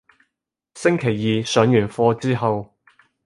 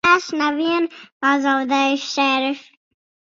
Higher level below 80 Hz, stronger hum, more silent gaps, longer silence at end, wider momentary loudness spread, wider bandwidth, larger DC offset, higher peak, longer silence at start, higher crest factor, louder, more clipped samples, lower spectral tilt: first, -56 dBFS vs -64 dBFS; neither; second, none vs 1.12-1.20 s; second, 0.6 s vs 0.75 s; about the same, 6 LU vs 7 LU; first, 11.5 kHz vs 7.6 kHz; neither; about the same, -2 dBFS vs -2 dBFS; first, 0.75 s vs 0.05 s; about the same, 20 dB vs 18 dB; about the same, -20 LUFS vs -19 LUFS; neither; first, -6 dB/octave vs -2.5 dB/octave